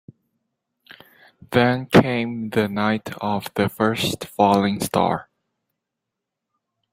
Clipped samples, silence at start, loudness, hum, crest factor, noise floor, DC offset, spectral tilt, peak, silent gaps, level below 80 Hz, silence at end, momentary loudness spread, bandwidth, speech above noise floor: under 0.1%; 1.5 s; -21 LUFS; none; 22 dB; -82 dBFS; under 0.1%; -5.5 dB/octave; -2 dBFS; none; -56 dBFS; 1.7 s; 8 LU; 16 kHz; 62 dB